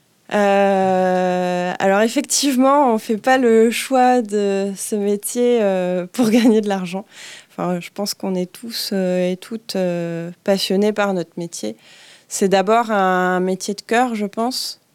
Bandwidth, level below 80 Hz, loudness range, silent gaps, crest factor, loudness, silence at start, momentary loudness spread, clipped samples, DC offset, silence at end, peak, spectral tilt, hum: 17.5 kHz; -72 dBFS; 6 LU; none; 14 dB; -18 LUFS; 0.3 s; 11 LU; under 0.1%; under 0.1%; 0.2 s; -4 dBFS; -4.5 dB/octave; none